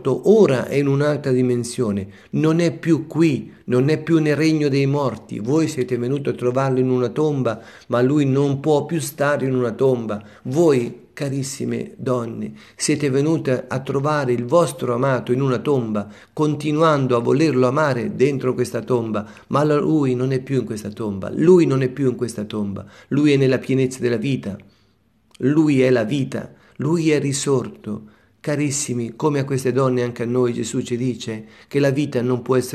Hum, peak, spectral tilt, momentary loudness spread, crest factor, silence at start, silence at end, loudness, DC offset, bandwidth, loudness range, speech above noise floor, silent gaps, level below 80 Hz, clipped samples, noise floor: none; -2 dBFS; -6.5 dB/octave; 10 LU; 18 dB; 0 s; 0 s; -20 LUFS; under 0.1%; 13.5 kHz; 3 LU; 41 dB; none; -60 dBFS; under 0.1%; -60 dBFS